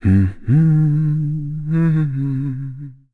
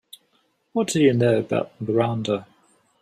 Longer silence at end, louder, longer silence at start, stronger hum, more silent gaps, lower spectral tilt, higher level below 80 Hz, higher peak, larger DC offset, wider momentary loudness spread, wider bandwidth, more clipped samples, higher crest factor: second, 0.2 s vs 0.6 s; first, -18 LUFS vs -22 LUFS; second, 0 s vs 0.75 s; neither; neither; first, -11 dB/octave vs -6 dB/octave; first, -40 dBFS vs -62 dBFS; about the same, -4 dBFS vs -6 dBFS; neither; first, 12 LU vs 9 LU; second, 2.8 kHz vs 14 kHz; neither; second, 12 dB vs 18 dB